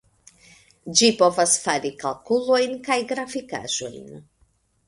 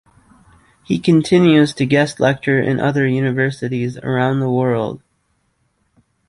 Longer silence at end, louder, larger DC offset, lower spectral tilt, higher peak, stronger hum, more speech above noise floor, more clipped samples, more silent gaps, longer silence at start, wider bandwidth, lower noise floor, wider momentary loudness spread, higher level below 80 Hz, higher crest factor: second, 0.65 s vs 1.3 s; second, -21 LUFS vs -16 LUFS; neither; second, -2 dB/octave vs -7 dB/octave; about the same, -2 dBFS vs -2 dBFS; neither; second, 42 dB vs 49 dB; neither; neither; about the same, 0.85 s vs 0.9 s; about the same, 11.5 kHz vs 11.5 kHz; about the same, -64 dBFS vs -65 dBFS; first, 13 LU vs 10 LU; second, -64 dBFS vs -54 dBFS; first, 22 dB vs 16 dB